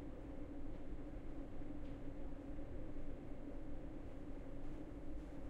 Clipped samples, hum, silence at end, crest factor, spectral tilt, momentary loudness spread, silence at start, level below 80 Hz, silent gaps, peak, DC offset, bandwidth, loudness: under 0.1%; none; 0 s; 10 dB; -8.5 dB/octave; 1 LU; 0 s; -50 dBFS; none; -34 dBFS; under 0.1%; 4.2 kHz; -53 LUFS